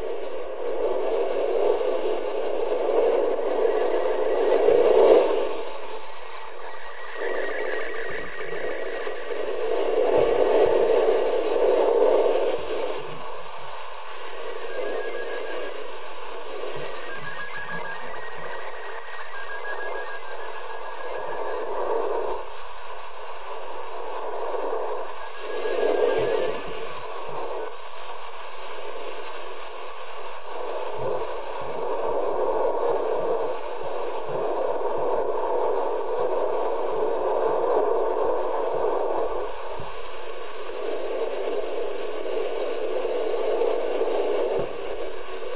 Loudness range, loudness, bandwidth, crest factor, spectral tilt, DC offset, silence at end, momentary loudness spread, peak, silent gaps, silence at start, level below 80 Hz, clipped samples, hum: 12 LU; -26 LUFS; 4 kHz; 22 dB; -8.5 dB/octave; 4%; 0 s; 16 LU; -4 dBFS; none; 0 s; -58 dBFS; under 0.1%; none